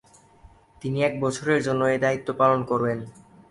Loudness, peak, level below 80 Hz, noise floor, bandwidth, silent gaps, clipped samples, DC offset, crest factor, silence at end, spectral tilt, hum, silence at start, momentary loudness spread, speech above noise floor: -24 LUFS; -6 dBFS; -58 dBFS; -53 dBFS; 11.5 kHz; none; under 0.1%; under 0.1%; 20 dB; 0.4 s; -6 dB/octave; none; 0.85 s; 11 LU; 30 dB